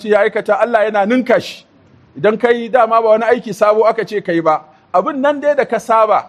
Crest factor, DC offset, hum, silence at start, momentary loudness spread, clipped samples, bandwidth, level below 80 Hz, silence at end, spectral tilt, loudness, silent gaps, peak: 14 dB; under 0.1%; none; 0 s; 5 LU; under 0.1%; 13 kHz; -62 dBFS; 0 s; -5.5 dB/octave; -14 LUFS; none; 0 dBFS